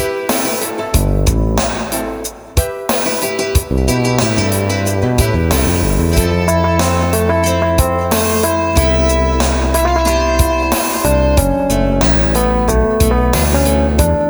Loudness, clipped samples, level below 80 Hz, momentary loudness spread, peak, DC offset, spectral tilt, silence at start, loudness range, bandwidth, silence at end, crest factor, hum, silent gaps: -14 LUFS; under 0.1%; -20 dBFS; 4 LU; 0 dBFS; under 0.1%; -5 dB/octave; 0 s; 3 LU; over 20 kHz; 0 s; 14 dB; none; none